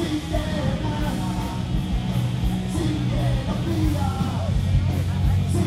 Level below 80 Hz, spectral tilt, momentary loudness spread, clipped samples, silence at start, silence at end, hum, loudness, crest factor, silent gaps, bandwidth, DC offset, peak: -30 dBFS; -7 dB/octave; 4 LU; under 0.1%; 0 s; 0 s; none; -24 LUFS; 14 dB; none; 15.5 kHz; under 0.1%; -8 dBFS